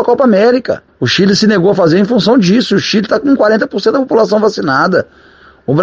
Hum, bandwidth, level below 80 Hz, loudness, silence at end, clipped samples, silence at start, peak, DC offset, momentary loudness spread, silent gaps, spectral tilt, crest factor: none; 7.6 kHz; -50 dBFS; -10 LUFS; 0 s; under 0.1%; 0 s; 0 dBFS; under 0.1%; 7 LU; none; -6 dB/octave; 10 dB